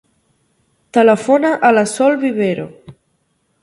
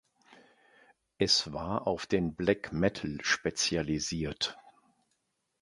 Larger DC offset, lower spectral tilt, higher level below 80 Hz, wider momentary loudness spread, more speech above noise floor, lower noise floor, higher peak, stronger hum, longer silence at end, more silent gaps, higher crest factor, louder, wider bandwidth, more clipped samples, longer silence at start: neither; first, -5 dB/octave vs -3.5 dB/octave; second, -62 dBFS vs -54 dBFS; about the same, 7 LU vs 8 LU; about the same, 51 dB vs 48 dB; second, -64 dBFS vs -79 dBFS; first, 0 dBFS vs -10 dBFS; neither; second, 0.7 s vs 0.9 s; neither; second, 16 dB vs 22 dB; first, -14 LUFS vs -31 LUFS; about the same, 11.5 kHz vs 11.5 kHz; neither; first, 0.95 s vs 0.3 s